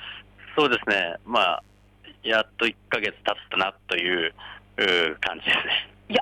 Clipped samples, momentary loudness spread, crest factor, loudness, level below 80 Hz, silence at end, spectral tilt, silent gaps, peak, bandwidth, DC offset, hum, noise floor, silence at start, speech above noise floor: under 0.1%; 10 LU; 16 dB; -24 LUFS; -58 dBFS; 0 s; -3.5 dB/octave; none; -10 dBFS; 15.5 kHz; under 0.1%; 50 Hz at -55 dBFS; -51 dBFS; 0 s; 27 dB